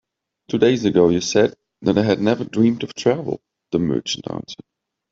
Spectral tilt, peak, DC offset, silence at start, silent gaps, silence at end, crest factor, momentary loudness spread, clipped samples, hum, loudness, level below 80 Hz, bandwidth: -5.5 dB/octave; -2 dBFS; under 0.1%; 0.5 s; none; 0.6 s; 18 dB; 14 LU; under 0.1%; none; -19 LUFS; -56 dBFS; 7.8 kHz